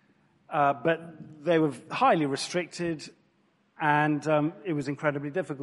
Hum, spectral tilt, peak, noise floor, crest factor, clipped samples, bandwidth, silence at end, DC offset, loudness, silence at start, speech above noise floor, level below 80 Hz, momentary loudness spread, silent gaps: none; -5.5 dB/octave; -10 dBFS; -68 dBFS; 18 dB; under 0.1%; 11.5 kHz; 0 s; under 0.1%; -28 LUFS; 0.5 s; 41 dB; -72 dBFS; 9 LU; none